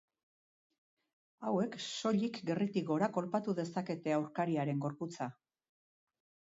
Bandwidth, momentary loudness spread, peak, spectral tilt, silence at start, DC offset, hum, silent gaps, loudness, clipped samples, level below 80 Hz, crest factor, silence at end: 7.6 kHz; 7 LU; -20 dBFS; -6 dB/octave; 1.4 s; under 0.1%; none; none; -36 LUFS; under 0.1%; -82 dBFS; 18 dB; 1.2 s